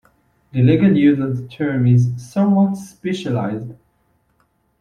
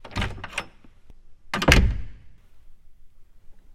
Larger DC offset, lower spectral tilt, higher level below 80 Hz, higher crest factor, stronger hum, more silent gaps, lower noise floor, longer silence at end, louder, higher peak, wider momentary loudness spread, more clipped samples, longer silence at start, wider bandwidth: neither; first, -8.5 dB/octave vs -4.5 dB/octave; second, -52 dBFS vs -30 dBFS; second, 16 dB vs 26 dB; neither; neither; first, -63 dBFS vs -46 dBFS; first, 1.1 s vs 0 s; first, -17 LUFS vs -23 LUFS; about the same, -2 dBFS vs 0 dBFS; second, 13 LU vs 23 LU; neither; first, 0.55 s vs 0.05 s; second, 10.5 kHz vs 16 kHz